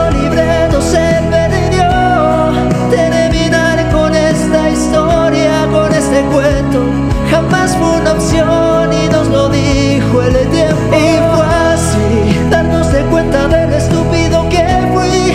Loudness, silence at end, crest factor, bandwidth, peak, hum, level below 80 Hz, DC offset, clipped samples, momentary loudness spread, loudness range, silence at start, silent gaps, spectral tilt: -11 LUFS; 0 s; 10 dB; 15 kHz; 0 dBFS; none; -22 dBFS; under 0.1%; under 0.1%; 2 LU; 1 LU; 0 s; none; -6 dB/octave